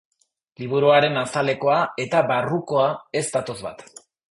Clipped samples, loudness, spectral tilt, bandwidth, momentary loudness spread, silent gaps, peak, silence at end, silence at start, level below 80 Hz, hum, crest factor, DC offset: under 0.1%; -21 LUFS; -4.5 dB/octave; 11.5 kHz; 16 LU; none; -4 dBFS; 0.5 s; 0.6 s; -64 dBFS; none; 18 dB; under 0.1%